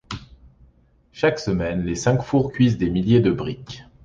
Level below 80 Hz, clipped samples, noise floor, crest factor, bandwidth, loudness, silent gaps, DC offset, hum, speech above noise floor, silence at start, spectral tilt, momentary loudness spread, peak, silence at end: -42 dBFS; under 0.1%; -57 dBFS; 16 dB; 7.8 kHz; -21 LUFS; none; under 0.1%; none; 36 dB; 0.1 s; -6.5 dB/octave; 17 LU; -4 dBFS; 0.2 s